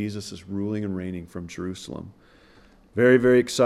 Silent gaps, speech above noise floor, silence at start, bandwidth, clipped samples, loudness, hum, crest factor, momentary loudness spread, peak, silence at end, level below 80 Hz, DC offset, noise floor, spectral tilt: none; 30 dB; 0 s; 13.5 kHz; under 0.1%; -23 LUFS; none; 20 dB; 19 LU; -4 dBFS; 0 s; -56 dBFS; under 0.1%; -54 dBFS; -5.5 dB/octave